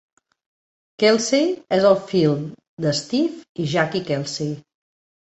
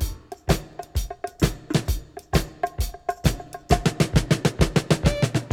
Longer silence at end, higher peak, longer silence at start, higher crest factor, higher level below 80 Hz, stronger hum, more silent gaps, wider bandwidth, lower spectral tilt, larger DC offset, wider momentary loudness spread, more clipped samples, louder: first, 0.65 s vs 0 s; about the same, -4 dBFS vs -2 dBFS; first, 1 s vs 0 s; about the same, 18 dB vs 22 dB; second, -62 dBFS vs -30 dBFS; neither; first, 2.68-2.77 s, 3.49-3.55 s vs none; second, 8.4 kHz vs 18 kHz; about the same, -5 dB/octave vs -5.5 dB/octave; neither; about the same, 11 LU vs 11 LU; neither; first, -20 LUFS vs -25 LUFS